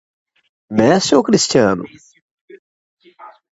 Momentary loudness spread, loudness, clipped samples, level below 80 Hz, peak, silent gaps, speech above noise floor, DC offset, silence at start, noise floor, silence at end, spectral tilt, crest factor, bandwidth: 11 LU; -14 LUFS; under 0.1%; -54 dBFS; 0 dBFS; 2.22-2.48 s, 2.59-2.97 s; 28 dB; under 0.1%; 0.7 s; -42 dBFS; 0.2 s; -4.5 dB/octave; 18 dB; 8 kHz